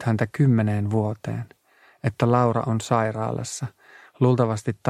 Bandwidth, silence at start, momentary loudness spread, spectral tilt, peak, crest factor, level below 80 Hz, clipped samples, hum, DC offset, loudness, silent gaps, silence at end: 12 kHz; 0 s; 12 LU; -7 dB/octave; -6 dBFS; 18 dB; -58 dBFS; under 0.1%; none; under 0.1%; -23 LUFS; none; 0 s